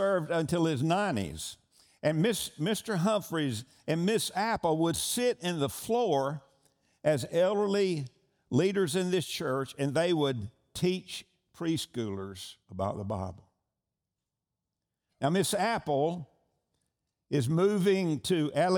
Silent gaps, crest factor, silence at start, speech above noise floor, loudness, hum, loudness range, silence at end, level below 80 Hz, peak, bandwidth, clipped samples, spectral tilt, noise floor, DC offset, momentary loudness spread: none; 16 dB; 0 s; 59 dB; -30 LUFS; none; 6 LU; 0 s; -64 dBFS; -14 dBFS; over 20 kHz; under 0.1%; -5 dB/octave; -88 dBFS; under 0.1%; 10 LU